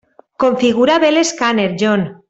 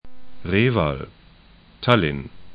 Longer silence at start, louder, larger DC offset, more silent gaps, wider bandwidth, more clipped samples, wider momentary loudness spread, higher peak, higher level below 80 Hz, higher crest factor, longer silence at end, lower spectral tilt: first, 0.4 s vs 0 s; first, -14 LUFS vs -21 LUFS; neither; neither; first, 8.2 kHz vs 5 kHz; neither; second, 4 LU vs 16 LU; about the same, -2 dBFS vs 0 dBFS; second, -54 dBFS vs -42 dBFS; second, 12 dB vs 24 dB; first, 0.15 s vs 0 s; second, -4.5 dB/octave vs -8.5 dB/octave